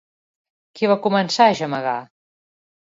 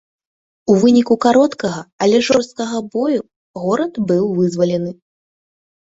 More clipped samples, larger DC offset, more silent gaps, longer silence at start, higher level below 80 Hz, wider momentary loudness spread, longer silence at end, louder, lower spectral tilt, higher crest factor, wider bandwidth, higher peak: neither; neither; second, none vs 1.93-1.99 s, 3.36-3.54 s; about the same, 0.75 s vs 0.65 s; second, -70 dBFS vs -58 dBFS; about the same, 9 LU vs 11 LU; about the same, 0.85 s vs 0.95 s; second, -19 LUFS vs -16 LUFS; about the same, -5 dB/octave vs -6 dB/octave; about the same, 20 dB vs 16 dB; about the same, 7.8 kHz vs 8 kHz; about the same, -2 dBFS vs 0 dBFS